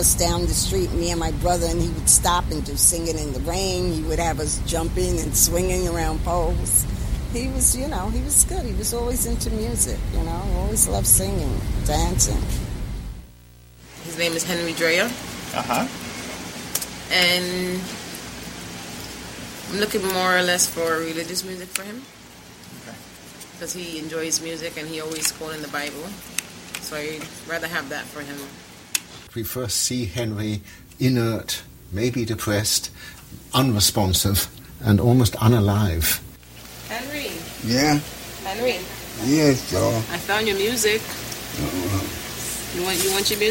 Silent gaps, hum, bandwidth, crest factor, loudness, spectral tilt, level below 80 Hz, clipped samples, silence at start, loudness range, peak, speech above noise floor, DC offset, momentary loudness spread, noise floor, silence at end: none; none; 16.5 kHz; 22 dB; -22 LUFS; -3.5 dB/octave; -32 dBFS; under 0.1%; 0 s; 8 LU; 0 dBFS; 25 dB; under 0.1%; 16 LU; -47 dBFS; 0 s